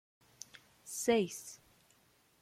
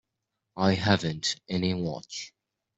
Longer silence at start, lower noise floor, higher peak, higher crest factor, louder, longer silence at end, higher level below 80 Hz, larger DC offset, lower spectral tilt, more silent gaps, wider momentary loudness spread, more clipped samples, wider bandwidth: first, 0.85 s vs 0.55 s; second, -70 dBFS vs -83 dBFS; second, -18 dBFS vs -8 dBFS; about the same, 22 dB vs 22 dB; second, -35 LUFS vs -28 LUFS; first, 0.85 s vs 0.5 s; second, -78 dBFS vs -60 dBFS; neither; second, -3.5 dB/octave vs -5 dB/octave; neither; first, 22 LU vs 14 LU; neither; first, 16 kHz vs 8.2 kHz